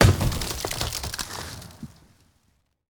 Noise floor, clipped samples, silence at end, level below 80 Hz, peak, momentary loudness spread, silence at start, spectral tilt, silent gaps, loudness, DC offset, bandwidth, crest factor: -68 dBFS; under 0.1%; 1.05 s; -36 dBFS; -2 dBFS; 18 LU; 0 s; -4.5 dB/octave; none; -27 LUFS; under 0.1%; over 20 kHz; 24 dB